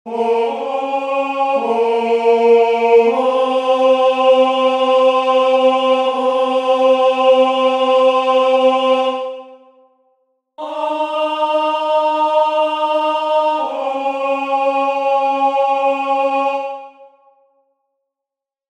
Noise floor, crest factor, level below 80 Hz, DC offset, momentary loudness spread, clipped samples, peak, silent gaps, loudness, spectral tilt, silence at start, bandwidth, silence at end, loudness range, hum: -85 dBFS; 14 dB; -76 dBFS; under 0.1%; 8 LU; under 0.1%; 0 dBFS; none; -15 LUFS; -3 dB/octave; 0.05 s; 10 kHz; 1.65 s; 6 LU; none